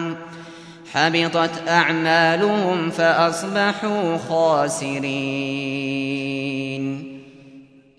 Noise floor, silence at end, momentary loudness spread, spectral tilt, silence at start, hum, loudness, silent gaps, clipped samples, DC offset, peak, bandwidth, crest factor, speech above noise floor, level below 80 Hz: -46 dBFS; 0.35 s; 15 LU; -4.5 dB/octave; 0 s; none; -20 LUFS; none; under 0.1%; under 0.1%; -2 dBFS; 11 kHz; 18 dB; 26 dB; -66 dBFS